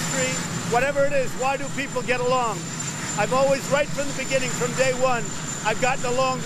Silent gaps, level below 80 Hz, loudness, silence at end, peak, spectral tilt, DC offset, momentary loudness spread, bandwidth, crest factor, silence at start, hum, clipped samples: none; -48 dBFS; -23 LUFS; 0 s; -6 dBFS; -3.5 dB/octave; under 0.1%; 6 LU; 14 kHz; 16 dB; 0 s; none; under 0.1%